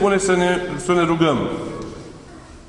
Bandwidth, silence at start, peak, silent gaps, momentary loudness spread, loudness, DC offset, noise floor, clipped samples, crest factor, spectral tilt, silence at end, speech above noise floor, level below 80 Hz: 11 kHz; 0 s; -2 dBFS; none; 20 LU; -19 LUFS; under 0.1%; -40 dBFS; under 0.1%; 18 dB; -5 dB/octave; 0 s; 22 dB; -44 dBFS